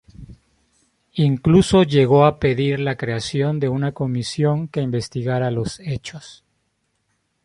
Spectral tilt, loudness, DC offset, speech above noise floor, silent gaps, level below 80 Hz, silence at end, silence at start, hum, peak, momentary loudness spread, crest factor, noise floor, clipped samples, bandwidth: -7 dB/octave; -19 LUFS; under 0.1%; 51 dB; none; -46 dBFS; 1.1 s; 0.2 s; none; -2 dBFS; 13 LU; 18 dB; -70 dBFS; under 0.1%; 11.5 kHz